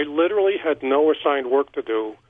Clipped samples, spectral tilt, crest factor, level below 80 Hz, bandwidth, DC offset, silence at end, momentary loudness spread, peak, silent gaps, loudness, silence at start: under 0.1%; -7 dB/octave; 14 dB; -64 dBFS; 3.8 kHz; under 0.1%; 0.15 s; 6 LU; -6 dBFS; none; -21 LUFS; 0 s